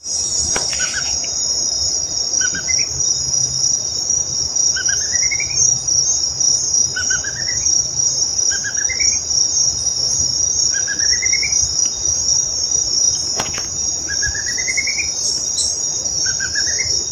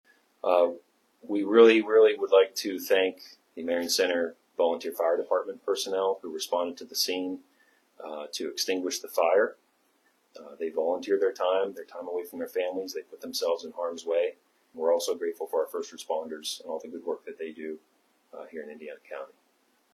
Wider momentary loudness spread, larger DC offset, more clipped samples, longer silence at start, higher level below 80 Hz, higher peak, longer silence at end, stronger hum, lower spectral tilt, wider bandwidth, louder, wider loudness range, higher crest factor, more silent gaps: second, 4 LU vs 18 LU; neither; neither; second, 0.05 s vs 0.45 s; first, -42 dBFS vs -82 dBFS; first, -2 dBFS vs -6 dBFS; second, 0 s vs 0.65 s; neither; second, 1 dB/octave vs -2 dB/octave; first, 16.5 kHz vs 14 kHz; first, -15 LUFS vs -28 LUFS; second, 2 LU vs 11 LU; second, 16 dB vs 22 dB; neither